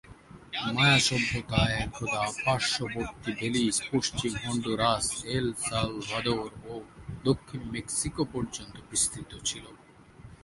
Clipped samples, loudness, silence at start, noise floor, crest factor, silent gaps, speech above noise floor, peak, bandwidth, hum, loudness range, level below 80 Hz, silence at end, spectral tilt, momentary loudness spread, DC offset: under 0.1%; -28 LUFS; 0.05 s; -52 dBFS; 22 dB; none; 22 dB; -8 dBFS; 11.5 kHz; none; 5 LU; -48 dBFS; 0.1 s; -3.5 dB/octave; 12 LU; under 0.1%